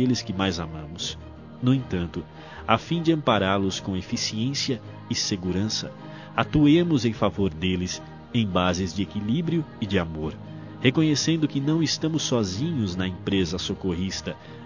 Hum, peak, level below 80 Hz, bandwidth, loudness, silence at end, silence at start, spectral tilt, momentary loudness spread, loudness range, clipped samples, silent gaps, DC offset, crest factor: none; -2 dBFS; -44 dBFS; 7.4 kHz; -25 LUFS; 0 s; 0 s; -5 dB/octave; 11 LU; 3 LU; under 0.1%; none; 0.1%; 22 dB